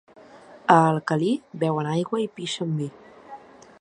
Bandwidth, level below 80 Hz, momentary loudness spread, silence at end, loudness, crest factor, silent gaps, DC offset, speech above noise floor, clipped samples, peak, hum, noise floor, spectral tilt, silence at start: 10.5 kHz; -68 dBFS; 26 LU; 0.45 s; -23 LUFS; 24 dB; none; under 0.1%; 25 dB; under 0.1%; -2 dBFS; none; -47 dBFS; -6 dB/octave; 0.35 s